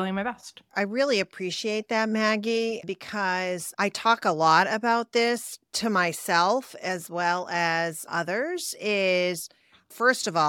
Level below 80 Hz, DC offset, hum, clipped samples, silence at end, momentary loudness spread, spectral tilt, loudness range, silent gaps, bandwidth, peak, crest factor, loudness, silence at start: -74 dBFS; under 0.1%; none; under 0.1%; 0 s; 9 LU; -3.5 dB/octave; 3 LU; none; 18.5 kHz; -6 dBFS; 20 dB; -25 LUFS; 0 s